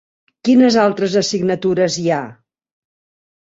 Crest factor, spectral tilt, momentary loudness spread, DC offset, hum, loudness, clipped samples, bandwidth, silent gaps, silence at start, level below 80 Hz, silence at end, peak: 16 dB; -5 dB/octave; 10 LU; under 0.1%; none; -16 LUFS; under 0.1%; 7.8 kHz; none; 0.45 s; -60 dBFS; 1.1 s; -2 dBFS